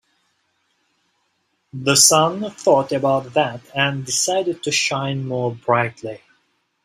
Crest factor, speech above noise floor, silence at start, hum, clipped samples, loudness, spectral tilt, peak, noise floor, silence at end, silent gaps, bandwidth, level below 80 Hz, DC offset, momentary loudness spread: 20 dB; 50 dB; 1.75 s; none; under 0.1%; -18 LUFS; -3 dB/octave; 0 dBFS; -69 dBFS; 0.7 s; none; 16 kHz; -62 dBFS; under 0.1%; 13 LU